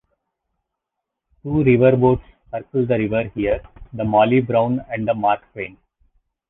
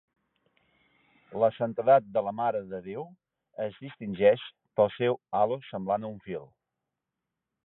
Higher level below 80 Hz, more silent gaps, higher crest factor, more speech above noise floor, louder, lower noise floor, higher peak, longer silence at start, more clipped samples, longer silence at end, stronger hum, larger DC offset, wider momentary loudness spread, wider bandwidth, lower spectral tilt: first, -44 dBFS vs -70 dBFS; neither; about the same, 18 dB vs 20 dB; first, 63 dB vs 59 dB; first, -19 LUFS vs -28 LUFS; second, -82 dBFS vs -87 dBFS; first, -2 dBFS vs -10 dBFS; first, 1.45 s vs 1.3 s; neither; second, 0.8 s vs 1.2 s; neither; neither; about the same, 18 LU vs 17 LU; about the same, 4 kHz vs 4.1 kHz; about the same, -11 dB/octave vs -10 dB/octave